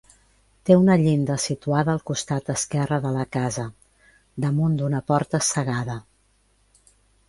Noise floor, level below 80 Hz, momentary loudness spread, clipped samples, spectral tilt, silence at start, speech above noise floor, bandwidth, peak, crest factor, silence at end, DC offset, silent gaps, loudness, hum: -63 dBFS; -54 dBFS; 13 LU; under 0.1%; -5.5 dB/octave; 0.65 s; 41 dB; 11.5 kHz; -2 dBFS; 22 dB; 1.25 s; under 0.1%; none; -23 LUFS; 50 Hz at -55 dBFS